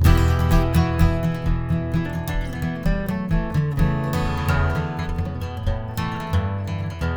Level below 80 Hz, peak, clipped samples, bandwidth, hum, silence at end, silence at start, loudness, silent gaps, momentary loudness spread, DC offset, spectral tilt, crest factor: -26 dBFS; -2 dBFS; under 0.1%; over 20 kHz; none; 0 s; 0 s; -23 LUFS; none; 8 LU; under 0.1%; -7 dB/octave; 18 dB